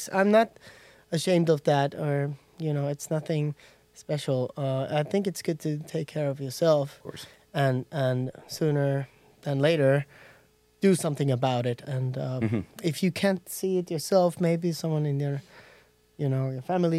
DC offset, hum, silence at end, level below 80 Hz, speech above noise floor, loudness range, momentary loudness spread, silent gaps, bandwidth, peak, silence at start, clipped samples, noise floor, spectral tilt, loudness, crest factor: under 0.1%; none; 0 s; -70 dBFS; 34 dB; 3 LU; 10 LU; none; 15.5 kHz; -8 dBFS; 0 s; under 0.1%; -60 dBFS; -6.5 dB/octave; -27 LUFS; 20 dB